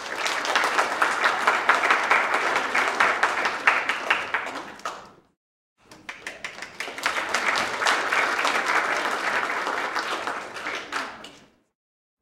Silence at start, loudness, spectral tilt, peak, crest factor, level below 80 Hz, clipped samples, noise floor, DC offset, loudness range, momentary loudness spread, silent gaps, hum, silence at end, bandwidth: 0 s; -23 LUFS; -0.5 dB/octave; -2 dBFS; 24 dB; -68 dBFS; under 0.1%; -51 dBFS; under 0.1%; 8 LU; 15 LU; 5.37-5.76 s; none; 0.85 s; 16.5 kHz